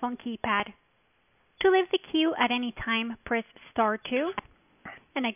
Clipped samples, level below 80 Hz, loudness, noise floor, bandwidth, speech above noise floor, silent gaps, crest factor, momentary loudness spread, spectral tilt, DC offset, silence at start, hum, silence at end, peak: under 0.1%; -60 dBFS; -28 LUFS; -69 dBFS; 3.7 kHz; 41 dB; none; 18 dB; 14 LU; -1.5 dB/octave; under 0.1%; 0 s; none; 0 s; -10 dBFS